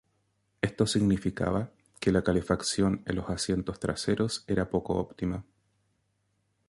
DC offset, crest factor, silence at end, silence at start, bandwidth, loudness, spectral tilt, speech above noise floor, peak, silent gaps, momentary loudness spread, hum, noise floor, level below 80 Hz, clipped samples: under 0.1%; 20 dB; 1.25 s; 0.65 s; 11.5 kHz; -29 LUFS; -5.5 dB/octave; 46 dB; -10 dBFS; none; 8 LU; none; -75 dBFS; -48 dBFS; under 0.1%